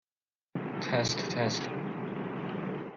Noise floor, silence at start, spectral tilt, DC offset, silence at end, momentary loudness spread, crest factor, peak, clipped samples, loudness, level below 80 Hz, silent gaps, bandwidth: under -90 dBFS; 0.55 s; -4.5 dB/octave; under 0.1%; 0 s; 8 LU; 18 dB; -16 dBFS; under 0.1%; -33 LUFS; -68 dBFS; none; 7.6 kHz